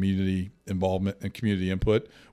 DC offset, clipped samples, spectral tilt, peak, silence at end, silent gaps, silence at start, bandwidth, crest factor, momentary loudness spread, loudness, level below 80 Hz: under 0.1%; under 0.1%; -7.5 dB/octave; -12 dBFS; 0.25 s; none; 0 s; 13.5 kHz; 16 dB; 6 LU; -28 LUFS; -44 dBFS